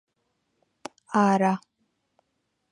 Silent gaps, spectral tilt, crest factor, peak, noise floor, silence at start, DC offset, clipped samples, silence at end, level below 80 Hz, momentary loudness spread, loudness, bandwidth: none; -6.5 dB/octave; 22 dB; -8 dBFS; -77 dBFS; 1.1 s; under 0.1%; under 0.1%; 1.15 s; -76 dBFS; 23 LU; -24 LUFS; 10.5 kHz